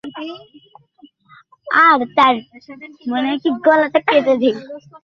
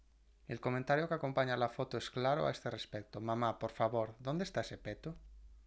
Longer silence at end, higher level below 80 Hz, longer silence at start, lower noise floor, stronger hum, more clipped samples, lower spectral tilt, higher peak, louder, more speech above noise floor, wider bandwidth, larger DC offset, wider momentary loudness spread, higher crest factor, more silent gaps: about the same, 0.05 s vs 0.05 s; about the same, -64 dBFS vs -62 dBFS; second, 0.05 s vs 0.5 s; second, -49 dBFS vs -59 dBFS; neither; neither; about the same, -5.5 dB/octave vs -6 dB/octave; first, -2 dBFS vs -20 dBFS; first, -15 LUFS vs -38 LUFS; first, 33 dB vs 21 dB; second, 7.2 kHz vs 8 kHz; neither; first, 19 LU vs 11 LU; about the same, 16 dB vs 18 dB; neither